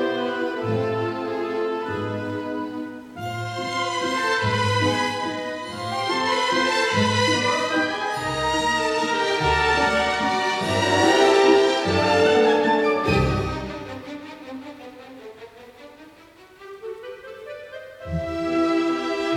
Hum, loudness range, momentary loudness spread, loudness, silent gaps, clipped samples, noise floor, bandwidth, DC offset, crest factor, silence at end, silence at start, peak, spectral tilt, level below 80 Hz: none; 18 LU; 19 LU; -21 LUFS; none; under 0.1%; -49 dBFS; 15.5 kHz; under 0.1%; 18 dB; 0 s; 0 s; -4 dBFS; -4.5 dB/octave; -46 dBFS